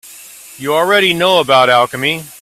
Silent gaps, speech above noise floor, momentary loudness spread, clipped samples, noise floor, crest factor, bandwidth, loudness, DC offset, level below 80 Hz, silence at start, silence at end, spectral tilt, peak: none; 24 dB; 8 LU; under 0.1%; -36 dBFS; 14 dB; 16.5 kHz; -11 LUFS; under 0.1%; -56 dBFS; 0.05 s; 0.1 s; -3.5 dB/octave; 0 dBFS